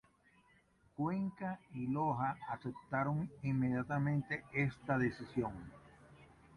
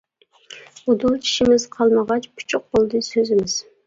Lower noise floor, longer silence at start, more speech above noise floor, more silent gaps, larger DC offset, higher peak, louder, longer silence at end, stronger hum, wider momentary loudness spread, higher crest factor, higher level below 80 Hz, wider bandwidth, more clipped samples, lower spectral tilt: first, -70 dBFS vs -46 dBFS; first, 1 s vs 0.5 s; first, 32 dB vs 27 dB; neither; neither; second, -22 dBFS vs -4 dBFS; second, -38 LUFS vs -19 LUFS; about the same, 0.3 s vs 0.25 s; neither; about the same, 8 LU vs 9 LU; about the same, 18 dB vs 16 dB; second, -66 dBFS vs -52 dBFS; first, 10.5 kHz vs 7.8 kHz; neither; first, -9 dB/octave vs -4 dB/octave